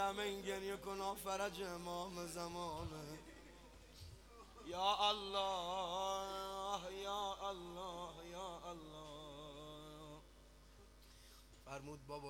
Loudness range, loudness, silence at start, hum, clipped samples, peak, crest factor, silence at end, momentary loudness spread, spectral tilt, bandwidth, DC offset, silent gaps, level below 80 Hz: 13 LU; -44 LUFS; 0 s; none; under 0.1%; -24 dBFS; 22 dB; 0 s; 21 LU; -3.5 dB/octave; 19.5 kHz; under 0.1%; none; -64 dBFS